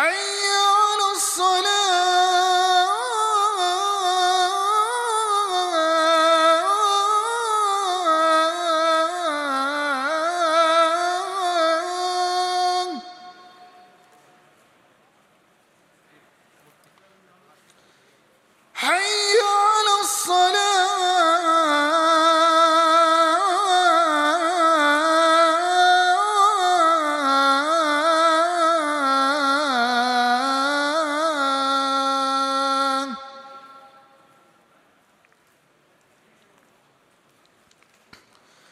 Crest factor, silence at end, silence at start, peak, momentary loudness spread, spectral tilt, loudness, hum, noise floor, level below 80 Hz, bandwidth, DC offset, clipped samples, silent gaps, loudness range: 14 dB; 4.9 s; 0 s; -6 dBFS; 6 LU; 0.5 dB/octave; -19 LUFS; none; -61 dBFS; -82 dBFS; 15.5 kHz; under 0.1%; under 0.1%; none; 8 LU